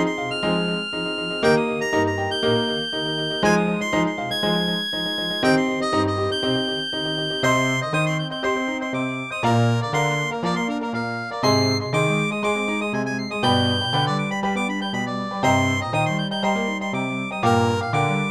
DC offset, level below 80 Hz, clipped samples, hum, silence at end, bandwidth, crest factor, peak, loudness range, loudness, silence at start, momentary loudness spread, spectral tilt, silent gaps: 0.1%; -54 dBFS; under 0.1%; none; 0 s; 15.5 kHz; 16 dB; -6 dBFS; 1 LU; -22 LUFS; 0 s; 6 LU; -5 dB/octave; none